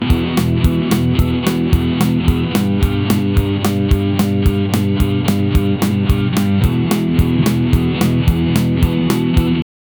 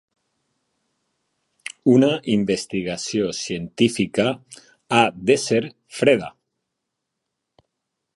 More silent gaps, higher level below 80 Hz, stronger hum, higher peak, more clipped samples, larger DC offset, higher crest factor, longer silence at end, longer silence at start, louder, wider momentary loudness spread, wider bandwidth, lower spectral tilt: neither; first, -22 dBFS vs -60 dBFS; neither; about the same, 0 dBFS vs 0 dBFS; neither; neither; second, 14 dB vs 22 dB; second, 0.35 s vs 1.85 s; second, 0 s vs 1.85 s; first, -15 LUFS vs -20 LUFS; second, 1 LU vs 13 LU; first, over 20 kHz vs 11.5 kHz; first, -6.5 dB/octave vs -5 dB/octave